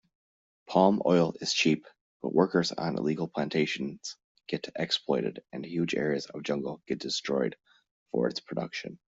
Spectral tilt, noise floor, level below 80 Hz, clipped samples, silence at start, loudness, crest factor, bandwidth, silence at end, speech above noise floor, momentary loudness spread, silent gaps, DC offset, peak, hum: -5 dB/octave; under -90 dBFS; -70 dBFS; under 0.1%; 0.7 s; -29 LUFS; 22 dB; 8 kHz; 0.15 s; over 61 dB; 12 LU; 2.01-2.20 s, 4.24-4.35 s, 7.91-8.06 s; under 0.1%; -8 dBFS; none